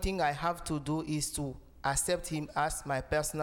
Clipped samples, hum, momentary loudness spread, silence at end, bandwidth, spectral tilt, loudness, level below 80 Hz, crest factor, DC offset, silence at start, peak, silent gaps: under 0.1%; none; 5 LU; 0 s; over 20 kHz; -4 dB/octave; -33 LUFS; -46 dBFS; 16 dB; under 0.1%; 0 s; -18 dBFS; none